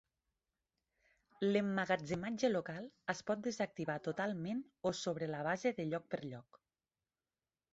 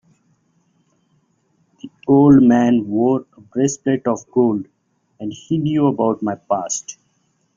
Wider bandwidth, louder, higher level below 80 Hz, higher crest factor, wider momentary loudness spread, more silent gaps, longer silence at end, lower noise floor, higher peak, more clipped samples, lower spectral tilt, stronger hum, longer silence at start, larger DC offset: about the same, 8 kHz vs 7.6 kHz; second, -39 LUFS vs -17 LUFS; second, -74 dBFS vs -54 dBFS; about the same, 20 dB vs 16 dB; second, 9 LU vs 18 LU; neither; first, 1.3 s vs 0.65 s; first, under -90 dBFS vs -64 dBFS; second, -20 dBFS vs -2 dBFS; neither; second, -4.5 dB/octave vs -6.5 dB/octave; neither; second, 1.4 s vs 1.85 s; neither